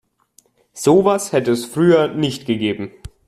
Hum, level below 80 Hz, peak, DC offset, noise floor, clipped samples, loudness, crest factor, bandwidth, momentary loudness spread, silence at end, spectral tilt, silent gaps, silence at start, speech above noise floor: none; -50 dBFS; -2 dBFS; under 0.1%; -56 dBFS; under 0.1%; -17 LUFS; 16 dB; 14.5 kHz; 8 LU; 0.2 s; -5.5 dB/octave; none; 0.75 s; 40 dB